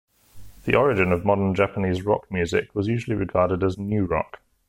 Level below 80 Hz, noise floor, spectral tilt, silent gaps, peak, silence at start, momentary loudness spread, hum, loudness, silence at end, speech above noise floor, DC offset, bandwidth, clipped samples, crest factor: -46 dBFS; -43 dBFS; -7.5 dB/octave; none; -4 dBFS; 0.35 s; 6 LU; none; -23 LUFS; 0.45 s; 21 dB; under 0.1%; 15.5 kHz; under 0.1%; 18 dB